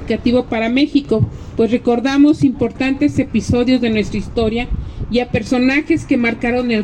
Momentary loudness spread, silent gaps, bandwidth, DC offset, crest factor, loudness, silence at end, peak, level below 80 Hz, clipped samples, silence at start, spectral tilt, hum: 6 LU; none; 9.4 kHz; under 0.1%; 12 dB; -16 LUFS; 0 s; -2 dBFS; -32 dBFS; under 0.1%; 0 s; -6.5 dB/octave; none